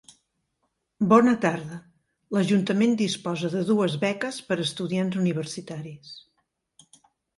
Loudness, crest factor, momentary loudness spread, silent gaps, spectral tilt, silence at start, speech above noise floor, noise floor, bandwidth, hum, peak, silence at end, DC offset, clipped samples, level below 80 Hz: -24 LUFS; 20 dB; 20 LU; none; -6 dB/octave; 1 s; 52 dB; -76 dBFS; 11.5 kHz; none; -6 dBFS; 1.2 s; under 0.1%; under 0.1%; -68 dBFS